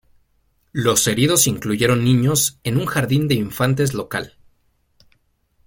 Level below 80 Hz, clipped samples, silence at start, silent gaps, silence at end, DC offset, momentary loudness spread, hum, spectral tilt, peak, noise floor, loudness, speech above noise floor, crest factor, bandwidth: -48 dBFS; under 0.1%; 0.75 s; none; 1.4 s; under 0.1%; 10 LU; none; -4 dB/octave; -2 dBFS; -63 dBFS; -18 LUFS; 45 dB; 18 dB; 17 kHz